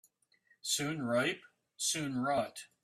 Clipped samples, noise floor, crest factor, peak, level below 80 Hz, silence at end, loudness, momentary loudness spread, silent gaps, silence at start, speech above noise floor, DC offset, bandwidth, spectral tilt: under 0.1%; -72 dBFS; 18 dB; -20 dBFS; -74 dBFS; 0.2 s; -34 LUFS; 10 LU; none; 0.65 s; 37 dB; under 0.1%; 15.5 kHz; -3 dB/octave